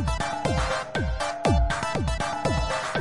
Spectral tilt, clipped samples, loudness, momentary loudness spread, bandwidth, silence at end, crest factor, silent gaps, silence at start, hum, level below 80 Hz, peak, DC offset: -5 dB/octave; under 0.1%; -26 LUFS; 4 LU; 11.5 kHz; 0 s; 16 dB; none; 0 s; none; -32 dBFS; -10 dBFS; 0.5%